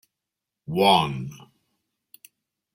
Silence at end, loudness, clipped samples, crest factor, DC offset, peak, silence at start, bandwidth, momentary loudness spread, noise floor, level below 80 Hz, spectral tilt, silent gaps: 1.4 s; -22 LUFS; under 0.1%; 22 dB; under 0.1%; -4 dBFS; 0.7 s; 16.5 kHz; 20 LU; -86 dBFS; -62 dBFS; -5 dB/octave; none